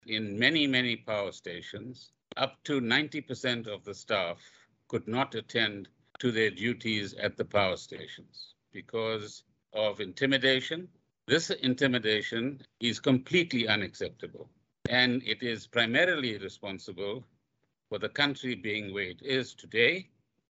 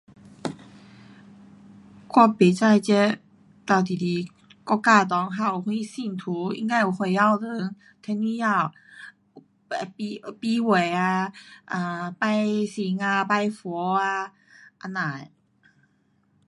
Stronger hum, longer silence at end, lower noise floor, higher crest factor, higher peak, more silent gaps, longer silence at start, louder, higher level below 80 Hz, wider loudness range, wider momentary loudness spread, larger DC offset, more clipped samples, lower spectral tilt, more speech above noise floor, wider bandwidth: neither; second, 0.45 s vs 1.2 s; first, -80 dBFS vs -66 dBFS; about the same, 22 dB vs 22 dB; second, -8 dBFS vs -4 dBFS; neither; second, 0.05 s vs 0.45 s; second, -30 LUFS vs -24 LUFS; about the same, -70 dBFS vs -72 dBFS; about the same, 5 LU vs 5 LU; about the same, 16 LU vs 17 LU; neither; neither; second, -4.5 dB/octave vs -6 dB/octave; first, 49 dB vs 42 dB; second, 8.2 kHz vs 11.5 kHz